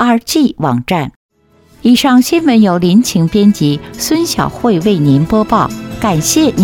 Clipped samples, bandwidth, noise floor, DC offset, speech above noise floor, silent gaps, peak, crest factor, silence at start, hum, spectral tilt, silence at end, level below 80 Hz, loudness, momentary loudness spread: under 0.1%; 18 kHz; -47 dBFS; under 0.1%; 37 dB; 1.16-1.29 s; 0 dBFS; 10 dB; 0 s; none; -5 dB/octave; 0 s; -38 dBFS; -11 LUFS; 7 LU